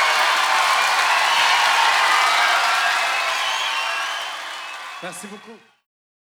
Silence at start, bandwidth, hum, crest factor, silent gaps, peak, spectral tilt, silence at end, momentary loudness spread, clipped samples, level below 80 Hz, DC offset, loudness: 0 s; over 20 kHz; none; 16 dB; none; -4 dBFS; 1.5 dB/octave; 0.65 s; 16 LU; under 0.1%; -70 dBFS; under 0.1%; -17 LUFS